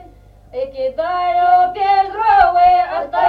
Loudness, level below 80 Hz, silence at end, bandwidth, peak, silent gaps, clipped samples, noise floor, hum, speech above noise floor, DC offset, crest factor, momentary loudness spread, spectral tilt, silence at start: -14 LUFS; -42 dBFS; 0 s; 5.2 kHz; 0 dBFS; none; under 0.1%; -43 dBFS; 50 Hz at -45 dBFS; 27 dB; under 0.1%; 14 dB; 12 LU; -5.5 dB/octave; 0 s